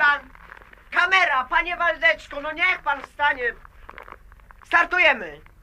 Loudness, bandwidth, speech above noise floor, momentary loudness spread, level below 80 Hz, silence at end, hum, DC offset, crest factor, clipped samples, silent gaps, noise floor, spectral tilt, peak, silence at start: -20 LUFS; 15 kHz; 25 dB; 10 LU; -50 dBFS; 0.25 s; none; under 0.1%; 18 dB; under 0.1%; none; -48 dBFS; -2.5 dB/octave; -4 dBFS; 0 s